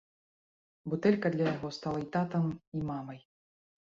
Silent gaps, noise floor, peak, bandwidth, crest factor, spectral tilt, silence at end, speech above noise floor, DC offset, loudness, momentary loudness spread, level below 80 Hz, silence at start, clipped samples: 2.67-2.72 s; under -90 dBFS; -12 dBFS; 7.6 kHz; 22 dB; -8 dB/octave; 0.75 s; over 58 dB; under 0.1%; -33 LUFS; 15 LU; -66 dBFS; 0.85 s; under 0.1%